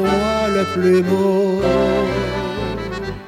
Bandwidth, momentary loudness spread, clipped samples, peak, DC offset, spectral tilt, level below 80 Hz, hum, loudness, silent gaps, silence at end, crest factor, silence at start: 15 kHz; 9 LU; under 0.1%; -4 dBFS; under 0.1%; -6.5 dB/octave; -36 dBFS; none; -18 LUFS; none; 0 s; 14 dB; 0 s